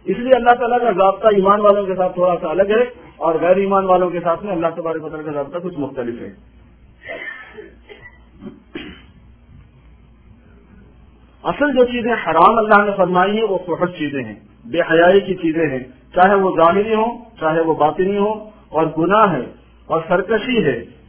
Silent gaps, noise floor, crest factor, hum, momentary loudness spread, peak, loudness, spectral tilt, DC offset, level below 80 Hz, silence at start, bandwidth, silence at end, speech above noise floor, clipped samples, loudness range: none; -46 dBFS; 18 dB; none; 15 LU; 0 dBFS; -16 LUFS; -10 dB/octave; under 0.1%; -48 dBFS; 0.05 s; 4 kHz; 0.2 s; 30 dB; under 0.1%; 16 LU